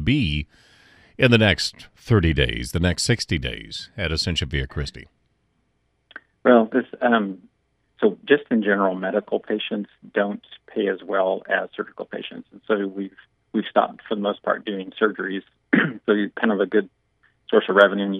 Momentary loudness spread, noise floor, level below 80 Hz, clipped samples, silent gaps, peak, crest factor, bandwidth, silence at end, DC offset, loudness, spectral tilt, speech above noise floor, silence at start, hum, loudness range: 15 LU; -69 dBFS; -40 dBFS; under 0.1%; none; 0 dBFS; 22 dB; 13 kHz; 0 s; under 0.1%; -22 LUFS; -5.5 dB/octave; 47 dB; 0 s; none; 5 LU